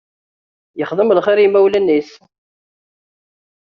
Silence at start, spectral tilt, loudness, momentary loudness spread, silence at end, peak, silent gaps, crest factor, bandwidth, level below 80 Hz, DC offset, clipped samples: 0.75 s; -4 dB/octave; -14 LUFS; 12 LU; 1.6 s; -2 dBFS; none; 14 dB; 6.4 kHz; -62 dBFS; under 0.1%; under 0.1%